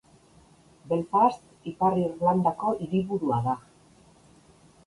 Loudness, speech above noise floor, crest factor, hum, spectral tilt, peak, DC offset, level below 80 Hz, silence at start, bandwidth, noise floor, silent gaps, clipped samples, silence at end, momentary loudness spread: -26 LUFS; 32 dB; 18 dB; none; -8.5 dB/octave; -10 dBFS; under 0.1%; -60 dBFS; 0.85 s; 11.5 kHz; -57 dBFS; none; under 0.1%; 1.25 s; 8 LU